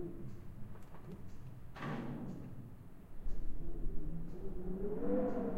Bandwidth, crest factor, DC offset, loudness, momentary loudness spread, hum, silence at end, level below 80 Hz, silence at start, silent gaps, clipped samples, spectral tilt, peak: 4.4 kHz; 14 dB; under 0.1%; -45 LUFS; 17 LU; none; 0 s; -46 dBFS; 0 s; none; under 0.1%; -8.5 dB/octave; -24 dBFS